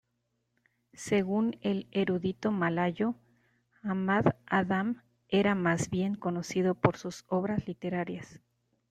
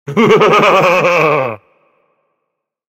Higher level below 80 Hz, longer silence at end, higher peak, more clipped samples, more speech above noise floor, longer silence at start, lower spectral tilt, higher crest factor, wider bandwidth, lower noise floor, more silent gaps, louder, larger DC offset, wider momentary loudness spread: second, -64 dBFS vs -54 dBFS; second, 0.55 s vs 1.35 s; second, -6 dBFS vs 0 dBFS; neither; second, 49 dB vs 64 dB; first, 1 s vs 0.05 s; about the same, -6.5 dB/octave vs -5.5 dB/octave; first, 26 dB vs 12 dB; second, 10.5 kHz vs 16.5 kHz; first, -79 dBFS vs -74 dBFS; neither; second, -30 LUFS vs -10 LUFS; neither; about the same, 11 LU vs 11 LU